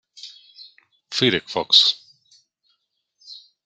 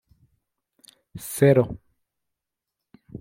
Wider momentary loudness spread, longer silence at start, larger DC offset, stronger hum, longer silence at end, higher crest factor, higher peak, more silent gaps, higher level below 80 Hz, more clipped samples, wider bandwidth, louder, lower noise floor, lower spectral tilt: about the same, 27 LU vs 26 LU; second, 0.25 s vs 1.15 s; neither; neither; first, 0.3 s vs 0.05 s; about the same, 24 dB vs 22 dB; first, 0 dBFS vs -4 dBFS; neither; second, -70 dBFS vs -56 dBFS; neither; second, 13 kHz vs 16.5 kHz; first, -17 LUFS vs -21 LUFS; second, -72 dBFS vs -85 dBFS; second, -3 dB/octave vs -7 dB/octave